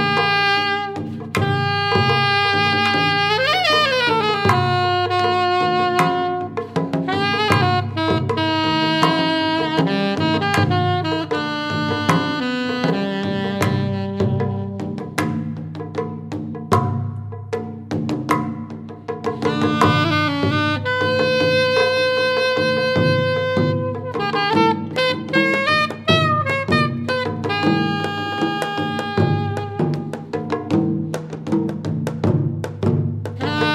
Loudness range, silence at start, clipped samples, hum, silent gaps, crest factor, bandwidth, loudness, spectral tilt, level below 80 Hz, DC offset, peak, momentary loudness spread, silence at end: 7 LU; 0 s; under 0.1%; none; none; 18 dB; 16 kHz; -19 LUFS; -6 dB/octave; -54 dBFS; under 0.1%; -2 dBFS; 10 LU; 0 s